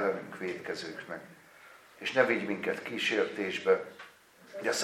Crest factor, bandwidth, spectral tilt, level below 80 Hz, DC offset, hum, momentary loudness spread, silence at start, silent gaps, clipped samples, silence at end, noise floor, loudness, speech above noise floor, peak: 24 dB; 15.5 kHz; -3 dB/octave; -82 dBFS; under 0.1%; none; 18 LU; 0 s; none; under 0.1%; 0 s; -56 dBFS; -32 LUFS; 24 dB; -8 dBFS